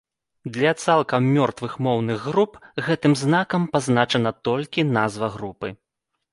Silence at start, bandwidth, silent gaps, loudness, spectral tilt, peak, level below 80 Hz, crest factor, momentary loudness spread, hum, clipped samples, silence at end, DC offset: 0.45 s; 11.5 kHz; none; -22 LUFS; -6 dB/octave; -4 dBFS; -58 dBFS; 18 dB; 11 LU; none; under 0.1%; 0.6 s; under 0.1%